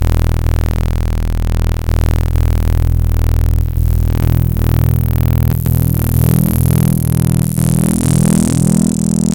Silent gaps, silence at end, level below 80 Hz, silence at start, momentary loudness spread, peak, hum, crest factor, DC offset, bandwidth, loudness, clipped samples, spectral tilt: none; 0 s; -18 dBFS; 0 s; 5 LU; -2 dBFS; none; 10 dB; under 0.1%; 17.5 kHz; -14 LUFS; under 0.1%; -6.5 dB/octave